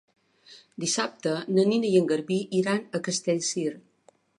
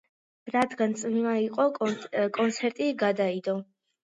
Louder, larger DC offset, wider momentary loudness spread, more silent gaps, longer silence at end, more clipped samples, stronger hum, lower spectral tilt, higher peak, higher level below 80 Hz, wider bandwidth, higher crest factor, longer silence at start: about the same, -26 LUFS vs -28 LUFS; neither; first, 8 LU vs 5 LU; neither; first, 0.6 s vs 0.4 s; neither; neither; about the same, -4.5 dB/octave vs -5 dB/octave; about the same, -10 dBFS vs -10 dBFS; about the same, -76 dBFS vs -76 dBFS; about the same, 11.5 kHz vs 10.5 kHz; about the same, 18 dB vs 16 dB; about the same, 0.5 s vs 0.45 s